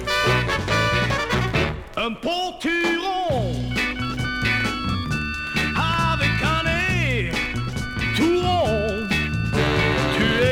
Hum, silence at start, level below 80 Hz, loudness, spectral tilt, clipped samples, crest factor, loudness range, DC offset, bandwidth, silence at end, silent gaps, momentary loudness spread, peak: none; 0 s; -34 dBFS; -21 LUFS; -5 dB/octave; under 0.1%; 14 dB; 2 LU; under 0.1%; 17 kHz; 0 s; none; 6 LU; -8 dBFS